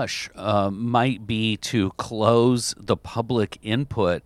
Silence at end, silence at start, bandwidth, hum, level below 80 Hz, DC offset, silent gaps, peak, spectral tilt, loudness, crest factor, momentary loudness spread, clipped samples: 0.05 s; 0 s; 14.5 kHz; none; -50 dBFS; under 0.1%; none; -2 dBFS; -5.5 dB/octave; -23 LUFS; 20 dB; 7 LU; under 0.1%